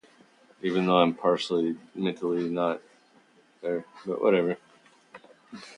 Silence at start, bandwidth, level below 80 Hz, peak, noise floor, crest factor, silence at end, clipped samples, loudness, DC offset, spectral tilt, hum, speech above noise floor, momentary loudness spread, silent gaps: 0.65 s; 10.5 kHz; -76 dBFS; -6 dBFS; -60 dBFS; 22 dB; 0 s; under 0.1%; -27 LUFS; under 0.1%; -6.5 dB/octave; none; 34 dB; 15 LU; none